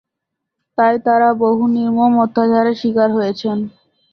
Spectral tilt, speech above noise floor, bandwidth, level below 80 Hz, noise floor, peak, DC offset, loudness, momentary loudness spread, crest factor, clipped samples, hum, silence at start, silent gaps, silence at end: -7.5 dB/octave; 65 dB; 6.2 kHz; -60 dBFS; -79 dBFS; -2 dBFS; under 0.1%; -15 LUFS; 8 LU; 14 dB; under 0.1%; none; 0.8 s; none; 0.45 s